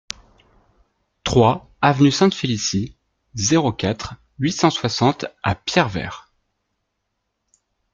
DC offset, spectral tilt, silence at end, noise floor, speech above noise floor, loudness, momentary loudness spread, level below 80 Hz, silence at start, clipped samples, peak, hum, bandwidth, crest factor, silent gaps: under 0.1%; -5 dB/octave; 1.75 s; -75 dBFS; 57 dB; -19 LUFS; 17 LU; -48 dBFS; 1.25 s; under 0.1%; -2 dBFS; none; 9.2 kHz; 20 dB; none